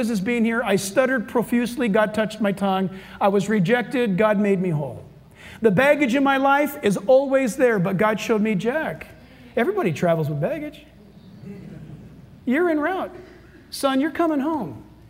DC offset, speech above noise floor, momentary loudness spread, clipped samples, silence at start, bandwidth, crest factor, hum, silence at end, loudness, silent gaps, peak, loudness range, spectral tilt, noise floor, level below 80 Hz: under 0.1%; 25 dB; 16 LU; under 0.1%; 0 s; 16 kHz; 16 dB; none; 0.25 s; -21 LUFS; none; -4 dBFS; 7 LU; -6 dB/octave; -46 dBFS; -56 dBFS